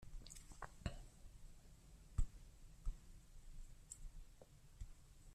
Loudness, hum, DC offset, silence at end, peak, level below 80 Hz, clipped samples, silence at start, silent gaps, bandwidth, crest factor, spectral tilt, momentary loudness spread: -57 LUFS; none; under 0.1%; 0 s; -28 dBFS; -52 dBFS; under 0.1%; 0 s; none; 13.5 kHz; 22 dB; -4.5 dB/octave; 16 LU